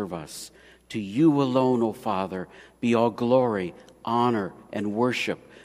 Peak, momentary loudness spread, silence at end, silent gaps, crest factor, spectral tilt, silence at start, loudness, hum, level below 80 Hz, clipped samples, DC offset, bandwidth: -6 dBFS; 15 LU; 0.25 s; none; 18 dB; -6.5 dB/octave; 0 s; -25 LUFS; none; -64 dBFS; under 0.1%; under 0.1%; 15.5 kHz